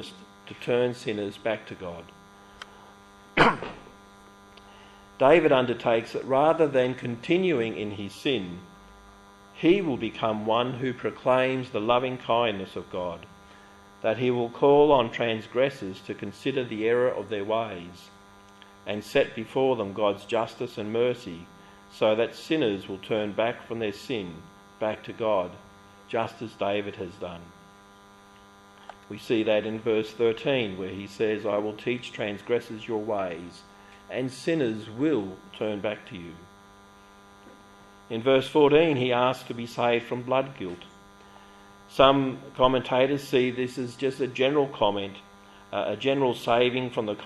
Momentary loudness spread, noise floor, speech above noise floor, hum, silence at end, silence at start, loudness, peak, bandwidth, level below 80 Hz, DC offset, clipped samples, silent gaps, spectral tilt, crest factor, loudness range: 16 LU; -52 dBFS; 26 dB; none; 0 s; 0 s; -26 LUFS; -4 dBFS; 12.5 kHz; -58 dBFS; under 0.1%; under 0.1%; none; -6 dB/octave; 24 dB; 7 LU